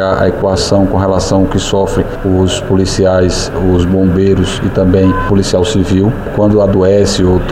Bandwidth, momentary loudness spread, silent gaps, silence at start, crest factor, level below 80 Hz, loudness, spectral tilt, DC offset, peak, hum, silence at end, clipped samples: 12.5 kHz; 4 LU; none; 0 s; 10 dB; -24 dBFS; -11 LUFS; -6 dB/octave; 0.1%; 0 dBFS; none; 0 s; under 0.1%